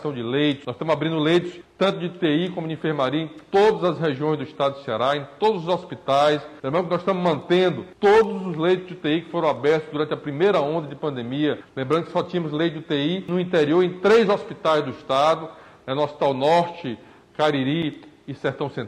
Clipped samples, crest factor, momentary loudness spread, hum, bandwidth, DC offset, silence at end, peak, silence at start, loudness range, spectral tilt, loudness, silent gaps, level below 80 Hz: under 0.1%; 14 dB; 9 LU; none; 10.5 kHz; under 0.1%; 0 s; -8 dBFS; 0 s; 3 LU; -6.5 dB/octave; -22 LUFS; none; -62 dBFS